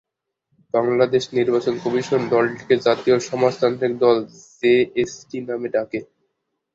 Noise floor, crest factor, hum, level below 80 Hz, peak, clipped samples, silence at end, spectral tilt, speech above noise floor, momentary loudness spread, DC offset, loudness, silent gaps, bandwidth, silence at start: -74 dBFS; 18 dB; none; -62 dBFS; -2 dBFS; under 0.1%; 0.7 s; -5.5 dB/octave; 55 dB; 9 LU; under 0.1%; -20 LUFS; none; 7.8 kHz; 0.75 s